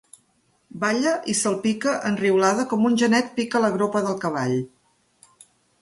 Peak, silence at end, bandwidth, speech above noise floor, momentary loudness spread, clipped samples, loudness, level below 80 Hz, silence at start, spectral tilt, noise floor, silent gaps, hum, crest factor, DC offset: -4 dBFS; 1.15 s; 11.5 kHz; 44 dB; 6 LU; under 0.1%; -22 LUFS; -66 dBFS; 0.75 s; -4.5 dB/octave; -65 dBFS; none; none; 18 dB; under 0.1%